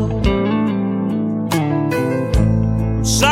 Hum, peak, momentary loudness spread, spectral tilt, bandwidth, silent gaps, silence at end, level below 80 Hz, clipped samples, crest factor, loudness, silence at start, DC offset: none; 0 dBFS; 4 LU; -5.5 dB/octave; 16 kHz; none; 0 s; -26 dBFS; under 0.1%; 16 dB; -18 LUFS; 0 s; under 0.1%